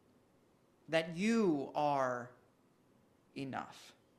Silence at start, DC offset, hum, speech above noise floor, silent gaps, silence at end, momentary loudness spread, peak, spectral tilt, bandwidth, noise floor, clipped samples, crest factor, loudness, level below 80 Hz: 0.9 s; under 0.1%; none; 35 dB; none; 0.3 s; 19 LU; -18 dBFS; -5.5 dB/octave; 13 kHz; -70 dBFS; under 0.1%; 20 dB; -36 LUFS; -80 dBFS